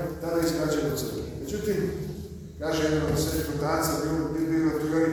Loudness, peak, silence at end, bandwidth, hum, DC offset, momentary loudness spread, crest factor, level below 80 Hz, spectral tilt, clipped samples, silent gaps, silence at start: -27 LUFS; -14 dBFS; 0 s; over 20 kHz; none; under 0.1%; 9 LU; 14 dB; -44 dBFS; -5.5 dB/octave; under 0.1%; none; 0 s